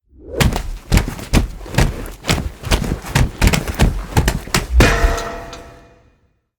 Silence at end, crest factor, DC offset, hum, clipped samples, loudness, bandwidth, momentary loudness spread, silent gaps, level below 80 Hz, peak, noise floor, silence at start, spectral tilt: 0.85 s; 18 dB; under 0.1%; none; under 0.1%; -18 LUFS; over 20 kHz; 12 LU; none; -22 dBFS; 0 dBFS; -59 dBFS; 0.2 s; -4.5 dB/octave